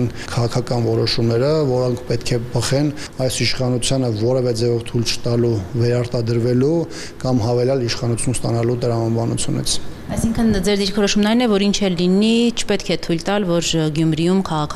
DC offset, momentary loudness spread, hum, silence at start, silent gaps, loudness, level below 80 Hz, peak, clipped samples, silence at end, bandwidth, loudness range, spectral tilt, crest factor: under 0.1%; 5 LU; none; 0 s; none; -18 LUFS; -36 dBFS; -6 dBFS; under 0.1%; 0 s; 14 kHz; 2 LU; -5.5 dB/octave; 12 dB